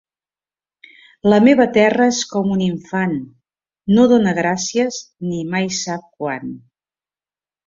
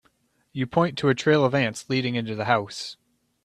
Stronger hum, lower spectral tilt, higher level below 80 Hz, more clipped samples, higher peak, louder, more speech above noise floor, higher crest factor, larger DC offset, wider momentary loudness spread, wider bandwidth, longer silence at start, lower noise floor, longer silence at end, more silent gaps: neither; about the same, -5 dB/octave vs -5.5 dB/octave; first, -56 dBFS vs -62 dBFS; neither; about the same, -2 dBFS vs -4 dBFS; first, -17 LUFS vs -24 LUFS; first, over 74 dB vs 43 dB; about the same, 16 dB vs 20 dB; neither; about the same, 14 LU vs 14 LU; second, 7.6 kHz vs 12.5 kHz; first, 1.25 s vs 0.55 s; first, under -90 dBFS vs -66 dBFS; first, 1.1 s vs 0.5 s; neither